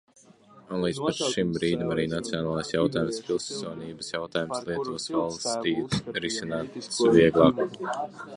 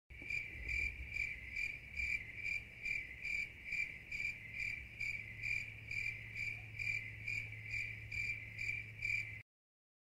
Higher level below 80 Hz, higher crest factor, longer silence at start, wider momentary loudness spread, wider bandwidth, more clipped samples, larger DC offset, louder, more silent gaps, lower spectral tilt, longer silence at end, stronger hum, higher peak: about the same, -56 dBFS vs -58 dBFS; first, 24 dB vs 16 dB; first, 0.55 s vs 0.1 s; first, 13 LU vs 3 LU; second, 11.5 kHz vs 16 kHz; neither; neither; first, -27 LUFS vs -41 LUFS; neither; first, -5 dB/octave vs -3 dB/octave; second, 0 s vs 0.6 s; neither; first, -4 dBFS vs -28 dBFS